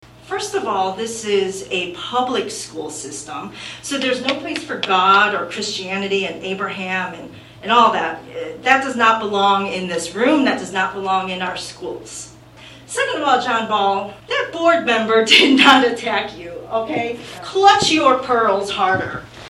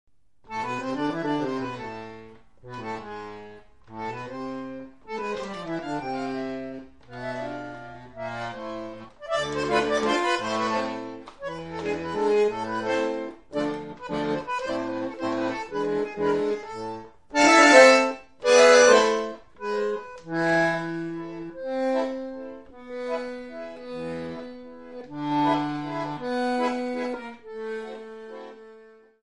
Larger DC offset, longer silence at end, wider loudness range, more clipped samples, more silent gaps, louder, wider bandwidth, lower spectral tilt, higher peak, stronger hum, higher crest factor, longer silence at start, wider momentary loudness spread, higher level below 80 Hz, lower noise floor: second, under 0.1% vs 0.2%; second, 0 s vs 0.3 s; second, 8 LU vs 16 LU; neither; neither; first, -17 LUFS vs -24 LUFS; first, 15.5 kHz vs 11.5 kHz; about the same, -3 dB/octave vs -3.5 dB/octave; about the same, 0 dBFS vs -2 dBFS; neither; second, 18 dB vs 24 dB; second, 0.25 s vs 0.5 s; second, 16 LU vs 19 LU; first, -54 dBFS vs -60 dBFS; second, -41 dBFS vs -51 dBFS